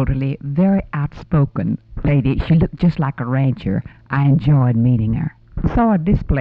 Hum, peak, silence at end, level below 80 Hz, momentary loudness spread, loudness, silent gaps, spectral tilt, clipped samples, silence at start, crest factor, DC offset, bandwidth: none; -6 dBFS; 0 s; -30 dBFS; 9 LU; -18 LUFS; none; -11 dB/octave; under 0.1%; 0 s; 12 dB; under 0.1%; 4.9 kHz